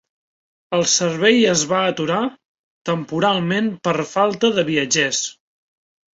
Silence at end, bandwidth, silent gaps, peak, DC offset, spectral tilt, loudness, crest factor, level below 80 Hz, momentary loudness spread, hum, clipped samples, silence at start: 0.8 s; 8 kHz; 2.45-2.85 s; -2 dBFS; under 0.1%; -3 dB/octave; -18 LUFS; 18 dB; -60 dBFS; 9 LU; none; under 0.1%; 0.7 s